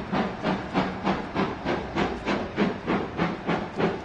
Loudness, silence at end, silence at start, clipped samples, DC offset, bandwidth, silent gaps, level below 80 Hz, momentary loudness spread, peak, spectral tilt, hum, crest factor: -28 LUFS; 0 s; 0 s; under 0.1%; under 0.1%; 8.6 kHz; none; -46 dBFS; 2 LU; -10 dBFS; -6.5 dB/octave; none; 18 dB